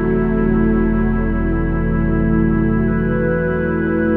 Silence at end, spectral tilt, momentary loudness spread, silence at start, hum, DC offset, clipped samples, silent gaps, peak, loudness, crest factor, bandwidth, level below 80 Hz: 0 s; -12 dB/octave; 3 LU; 0 s; none; under 0.1%; under 0.1%; none; -4 dBFS; -17 LUFS; 12 dB; 3.5 kHz; -24 dBFS